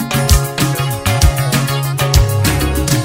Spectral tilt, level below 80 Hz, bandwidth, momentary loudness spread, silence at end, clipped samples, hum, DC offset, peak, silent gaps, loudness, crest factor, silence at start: -4.5 dB/octave; -20 dBFS; 16.5 kHz; 3 LU; 0 s; under 0.1%; none; under 0.1%; 0 dBFS; none; -14 LUFS; 14 dB; 0 s